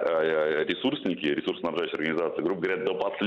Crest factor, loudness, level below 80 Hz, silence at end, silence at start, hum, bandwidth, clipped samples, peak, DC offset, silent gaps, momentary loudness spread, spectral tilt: 14 dB; -28 LUFS; -68 dBFS; 0 s; 0 s; none; 7.4 kHz; under 0.1%; -14 dBFS; under 0.1%; none; 4 LU; -6.5 dB/octave